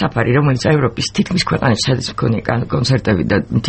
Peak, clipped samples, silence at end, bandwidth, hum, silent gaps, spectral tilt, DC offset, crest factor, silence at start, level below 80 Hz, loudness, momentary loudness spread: -2 dBFS; under 0.1%; 0 s; 8.8 kHz; none; none; -5.5 dB/octave; under 0.1%; 14 dB; 0 s; -38 dBFS; -16 LUFS; 4 LU